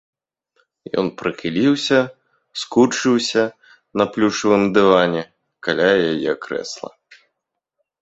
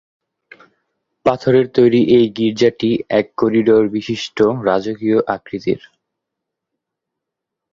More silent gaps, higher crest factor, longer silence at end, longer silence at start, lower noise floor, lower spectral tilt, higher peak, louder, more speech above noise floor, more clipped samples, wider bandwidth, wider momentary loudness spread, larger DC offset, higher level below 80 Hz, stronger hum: neither; about the same, 18 dB vs 16 dB; second, 1.15 s vs 1.95 s; second, 0.95 s vs 1.25 s; about the same, -79 dBFS vs -81 dBFS; second, -4.5 dB/octave vs -7 dB/octave; about the same, 0 dBFS vs -2 dBFS; about the same, -18 LUFS vs -16 LUFS; second, 61 dB vs 66 dB; neither; first, 8.2 kHz vs 7.4 kHz; first, 14 LU vs 9 LU; neither; about the same, -58 dBFS vs -54 dBFS; neither